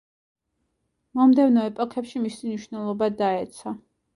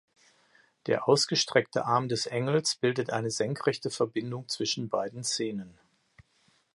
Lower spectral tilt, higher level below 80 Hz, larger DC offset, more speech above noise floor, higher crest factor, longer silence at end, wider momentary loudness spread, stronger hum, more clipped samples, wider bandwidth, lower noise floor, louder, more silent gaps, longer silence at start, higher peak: first, -6.5 dB/octave vs -4 dB/octave; about the same, -68 dBFS vs -70 dBFS; neither; first, 53 dB vs 39 dB; second, 16 dB vs 22 dB; second, 0.4 s vs 0.55 s; first, 16 LU vs 10 LU; neither; neither; about the same, 11.5 kHz vs 11.5 kHz; first, -75 dBFS vs -68 dBFS; first, -23 LUFS vs -29 LUFS; neither; first, 1.15 s vs 0.85 s; about the same, -8 dBFS vs -8 dBFS